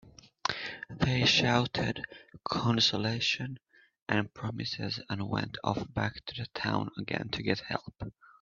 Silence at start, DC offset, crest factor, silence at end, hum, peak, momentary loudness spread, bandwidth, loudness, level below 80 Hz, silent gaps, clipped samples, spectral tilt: 0.05 s; under 0.1%; 24 dB; 0.3 s; none; -8 dBFS; 15 LU; 7.6 kHz; -31 LUFS; -58 dBFS; 4.02-4.06 s; under 0.1%; -4.5 dB/octave